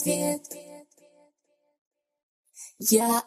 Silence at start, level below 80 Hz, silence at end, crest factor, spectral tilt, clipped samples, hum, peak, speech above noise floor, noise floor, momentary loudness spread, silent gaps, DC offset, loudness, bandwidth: 0 s; -72 dBFS; 0.05 s; 22 dB; -3.5 dB/octave; under 0.1%; none; -8 dBFS; 48 dB; -73 dBFS; 23 LU; 1.81-1.91 s, 2.23-2.44 s; under 0.1%; -25 LUFS; 15.5 kHz